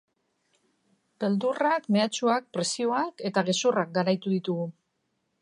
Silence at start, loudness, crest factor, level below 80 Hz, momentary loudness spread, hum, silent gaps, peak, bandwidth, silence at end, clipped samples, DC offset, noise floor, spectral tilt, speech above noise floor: 1.2 s; -27 LUFS; 20 dB; -80 dBFS; 6 LU; none; none; -8 dBFS; 11 kHz; 0.7 s; under 0.1%; under 0.1%; -77 dBFS; -4.5 dB/octave; 50 dB